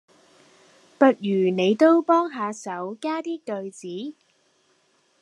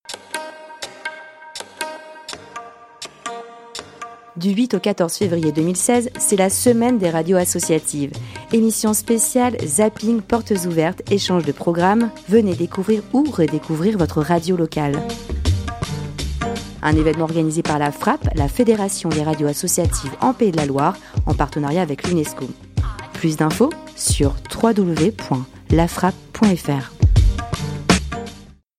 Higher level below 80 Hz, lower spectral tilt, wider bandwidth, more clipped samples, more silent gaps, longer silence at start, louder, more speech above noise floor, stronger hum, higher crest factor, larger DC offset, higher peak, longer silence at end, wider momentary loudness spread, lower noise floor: second, -82 dBFS vs -30 dBFS; about the same, -6 dB/octave vs -5 dB/octave; second, 10.5 kHz vs 16 kHz; neither; neither; first, 1 s vs 0.1 s; second, -22 LUFS vs -19 LUFS; first, 43 dB vs 23 dB; neither; about the same, 22 dB vs 18 dB; neither; about the same, -2 dBFS vs 0 dBFS; first, 1.1 s vs 0.35 s; about the same, 16 LU vs 15 LU; first, -65 dBFS vs -41 dBFS